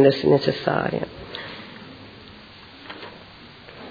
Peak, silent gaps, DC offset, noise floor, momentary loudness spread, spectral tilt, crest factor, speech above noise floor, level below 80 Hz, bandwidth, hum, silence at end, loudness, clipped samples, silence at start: -2 dBFS; none; under 0.1%; -44 dBFS; 24 LU; -7.5 dB/octave; 22 dB; 25 dB; -56 dBFS; 5 kHz; none; 0 s; -23 LUFS; under 0.1%; 0 s